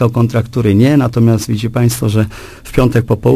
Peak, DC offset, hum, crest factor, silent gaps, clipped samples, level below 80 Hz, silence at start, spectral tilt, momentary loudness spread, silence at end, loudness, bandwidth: 0 dBFS; under 0.1%; none; 12 dB; none; under 0.1%; -32 dBFS; 0 s; -7 dB/octave; 7 LU; 0 s; -13 LUFS; 15.5 kHz